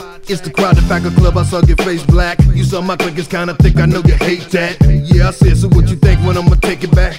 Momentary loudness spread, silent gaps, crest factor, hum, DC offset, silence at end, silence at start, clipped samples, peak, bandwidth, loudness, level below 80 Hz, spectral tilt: 7 LU; none; 10 dB; none; under 0.1%; 0 s; 0 s; 2%; 0 dBFS; 15 kHz; -12 LUFS; -14 dBFS; -7 dB/octave